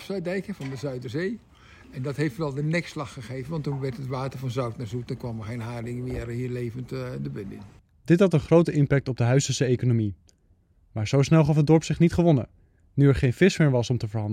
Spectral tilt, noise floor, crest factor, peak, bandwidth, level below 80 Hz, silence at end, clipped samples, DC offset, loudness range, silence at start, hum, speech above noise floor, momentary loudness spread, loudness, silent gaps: -7 dB/octave; -62 dBFS; 18 dB; -6 dBFS; 11.5 kHz; -48 dBFS; 0 s; under 0.1%; under 0.1%; 10 LU; 0 s; none; 38 dB; 15 LU; -25 LUFS; none